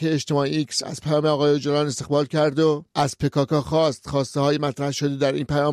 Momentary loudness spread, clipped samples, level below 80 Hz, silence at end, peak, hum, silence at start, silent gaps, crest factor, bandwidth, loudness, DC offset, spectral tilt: 5 LU; under 0.1%; -52 dBFS; 0 s; -8 dBFS; none; 0 s; none; 12 dB; 13.5 kHz; -22 LUFS; under 0.1%; -5.5 dB/octave